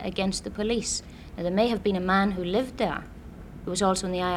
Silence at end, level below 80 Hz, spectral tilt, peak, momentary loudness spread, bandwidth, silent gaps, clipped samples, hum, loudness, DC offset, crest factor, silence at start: 0 s; -46 dBFS; -4.5 dB/octave; -10 dBFS; 16 LU; 13.5 kHz; none; under 0.1%; none; -27 LUFS; under 0.1%; 18 dB; 0 s